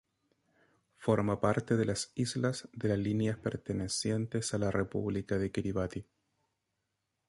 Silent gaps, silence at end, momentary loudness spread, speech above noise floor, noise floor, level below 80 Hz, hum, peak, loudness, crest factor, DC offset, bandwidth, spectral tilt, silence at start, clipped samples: none; 1.25 s; 6 LU; 51 dB; -84 dBFS; -56 dBFS; none; -14 dBFS; -33 LUFS; 20 dB; under 0.1%; 11.5 kHz; -5.5 dB/octave; 1 s; under 0.1%